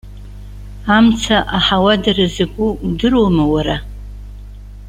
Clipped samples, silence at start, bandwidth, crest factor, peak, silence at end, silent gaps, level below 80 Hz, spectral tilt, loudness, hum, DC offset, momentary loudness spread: under 0.1%; 0.05 s; 11 kHz; 16 dB; 0 dBFS; 0 s; none; -30 dBFS; -5.5 dB/octave; -14 LUFS; 50 Hz at -30 dBFS; under 0.1%; 23 LU